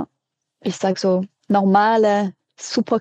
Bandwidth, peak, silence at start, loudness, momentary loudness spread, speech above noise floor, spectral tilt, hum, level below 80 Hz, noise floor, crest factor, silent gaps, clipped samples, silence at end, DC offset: 8.6 kHz; -4 dBFS; 0 s; -19 LUFS; 14 LU; 61 dB; -5.5 dB/octave; none; -70 dBFS; -78 dBFS; 14 dB; none; under 0.1%; 0 s; under 0.1%